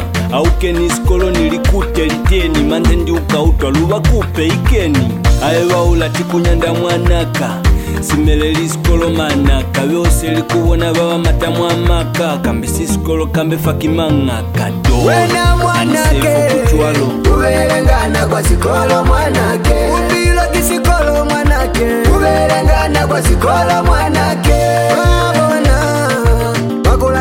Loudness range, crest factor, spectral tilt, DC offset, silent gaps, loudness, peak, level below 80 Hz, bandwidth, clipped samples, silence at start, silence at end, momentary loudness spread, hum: 2 LU; 12 dB; -5.5 dB/octave; under 0.1%; none; -12 LUFS; 0 dBFS; -16 dBFS; 17 kHz; under 0.1%; 0 s; 0 s; 3 LU; none